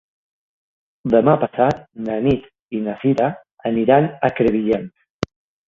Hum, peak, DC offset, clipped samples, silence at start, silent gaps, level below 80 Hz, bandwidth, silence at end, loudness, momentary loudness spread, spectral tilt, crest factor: none; 0 dBFS; under 0.1%; under 0.1%; 1.05 s; 2.61-2.69 s, 5.10-5.20 s; -48 dBFS; 7.4 kHz; 0.45 s; -19 LUFS; 14 LU; -8.5 dB/octave; 20 dB